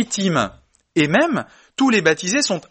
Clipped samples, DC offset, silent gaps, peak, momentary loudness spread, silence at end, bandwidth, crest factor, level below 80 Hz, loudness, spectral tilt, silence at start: under 0.1%; under 0.1%; none; 0 dBFS; 10 LU; 0.1 s; 8.8 kHz; 18 dB; -56 dBFS; -18 LUFS; -4 dB/octave; 0 s